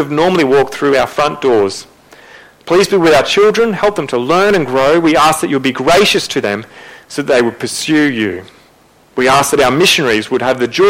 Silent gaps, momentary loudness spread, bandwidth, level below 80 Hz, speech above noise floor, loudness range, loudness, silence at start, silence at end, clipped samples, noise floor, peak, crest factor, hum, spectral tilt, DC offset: none; 9 LU; 16.5 kHz; -44 dBFS; 36 dB; 3 LU; -12 LUFS; 0 s; 0 s; under 0.1%; -47 dBFS; 0 dBFS; 12 dB; none; -4 dB/octave; under 0.1%